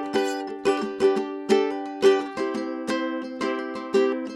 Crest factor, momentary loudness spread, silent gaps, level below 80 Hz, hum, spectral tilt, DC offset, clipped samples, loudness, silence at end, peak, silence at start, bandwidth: 18 dB; 8 LU; none; -66 dBFS; none; -4.5 dB/octave; under 0.1%; under 0.1%; -25 LUFS; 0 s; -6 dBFS; 0 s; 12 kHz